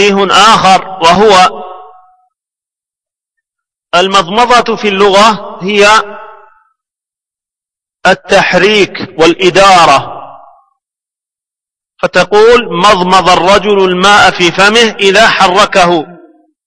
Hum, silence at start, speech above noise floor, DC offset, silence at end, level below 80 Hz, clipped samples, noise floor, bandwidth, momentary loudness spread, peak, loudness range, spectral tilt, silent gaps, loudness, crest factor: none; 0 s; 80 dB; under 0.1%; 0.55 s; -38 dBFS; 3%; -86 dBFS; 11 kHz; 8 LU; 0 dBFS; 6 LU; -3.5 dB/octave; none; -6 LUFS; 8 dB